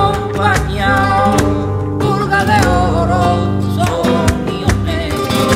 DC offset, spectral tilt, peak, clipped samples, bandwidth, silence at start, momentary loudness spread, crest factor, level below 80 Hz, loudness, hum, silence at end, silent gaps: under 0.1%; -5.5 dB/octave; 0 dBFS; under 0.1%; 16 kHz; 0 s; 5 LU; 12 dB; -26 dBFS; -14 LUFS; none; 0 s; none